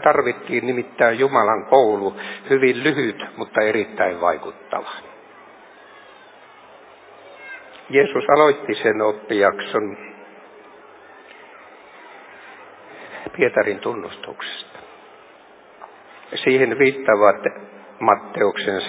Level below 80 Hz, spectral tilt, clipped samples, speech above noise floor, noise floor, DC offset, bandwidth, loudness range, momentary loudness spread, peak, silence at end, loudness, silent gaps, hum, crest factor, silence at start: -66 dBFS; -8.5 dB/octave; under 0.1%; 28 dB; -47 dBFS; under 0.1%; 4 kHz; 13 LU; 22 LU; 0 dBFS; 0 s; -19 LUFS; none; none; 22 dB; 0 s